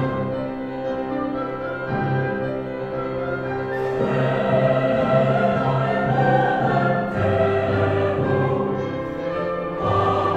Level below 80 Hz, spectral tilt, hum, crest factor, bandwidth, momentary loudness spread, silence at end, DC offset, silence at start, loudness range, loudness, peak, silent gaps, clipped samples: -46 dBFS; -8.5 dB/octave; none; 16 dB; 8 kHz; 8 LU; 0 s; under 0.1%; 0 s; 6 LU; -22 LUFS; -6 dBFS; none; under 0.1%